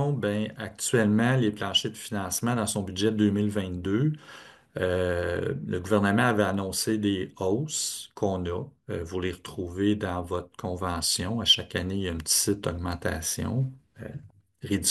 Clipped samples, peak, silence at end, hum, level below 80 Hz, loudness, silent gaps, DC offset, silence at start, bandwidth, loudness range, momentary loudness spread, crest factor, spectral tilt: under 0.1%; -8 dBFS; 0 s; none; -56 dBFS; -27 LUFS; none; under 0.1%; 0 s; 13 kHz; 4 LU; 13 LU; 20 dB; -4 dB/octave